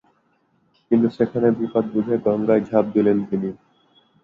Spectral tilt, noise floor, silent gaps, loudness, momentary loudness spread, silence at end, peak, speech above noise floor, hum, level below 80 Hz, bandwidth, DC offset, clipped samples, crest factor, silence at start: -10 dB/octave; -64 dBFS; none; -20 LUFS; 5 LU; 0.7 s; -4 dBFS; 45 dB; none; -60 dBFS; 4.9 kHz; under 0.1%; under 0.1%; 18 dB; 0.9 s